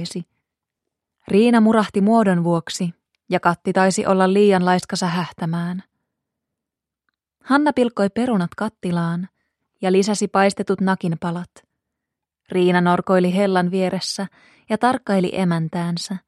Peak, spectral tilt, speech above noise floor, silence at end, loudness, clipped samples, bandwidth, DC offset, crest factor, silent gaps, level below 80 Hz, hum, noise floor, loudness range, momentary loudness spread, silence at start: 0 dBFS; -6 dB/octave; 67 dB; 0.1 s; -19 LUFS; under 0.1%; 12 kHz; under 0.1%; 18 dB; none; -62 dBFS; none; -85 dBFS; 5 LU; 11 LU; 0 s